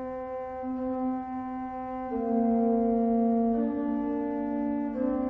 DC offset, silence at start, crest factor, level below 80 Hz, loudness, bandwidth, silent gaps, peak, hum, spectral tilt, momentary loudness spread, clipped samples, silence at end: under 0.1%; 0 s; 12 dB; -56 dBFS; -29 LUFS; 3.1 kHz; none; -16 dBFS; none; -10.5 dB/octave; 10 LU; under 0.1%; 0 s